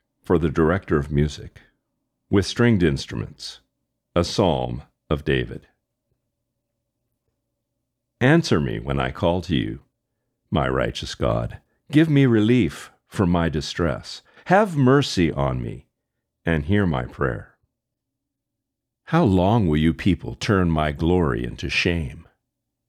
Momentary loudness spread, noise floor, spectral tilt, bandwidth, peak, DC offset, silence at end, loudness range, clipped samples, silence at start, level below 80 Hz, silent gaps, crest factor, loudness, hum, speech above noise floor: 15 LU; -82 dBFS; -6.5 dB/octave; 12.5 kHz; -4 dBFS; under 0.1%; 0.65 s; 6 LU; under 0.1%; 0.3 s; -38 dBFS; none; 18 dB; -21 LUFS; none; 61 dB